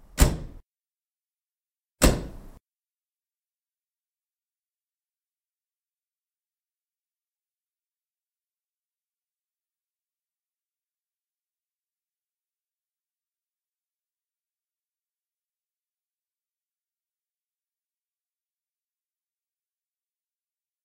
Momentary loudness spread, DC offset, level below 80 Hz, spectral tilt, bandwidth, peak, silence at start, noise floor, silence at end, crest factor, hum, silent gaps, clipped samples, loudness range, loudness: 20 LU; under 0.1%; -38 dBFS; -4.5 dB/octave; 16 kHz; -2 dBFS; 0.15 s; under -90 dBFS; 18.35 s; 34 dB; none; none; under 0.1%; 2 LU; -24 LUFS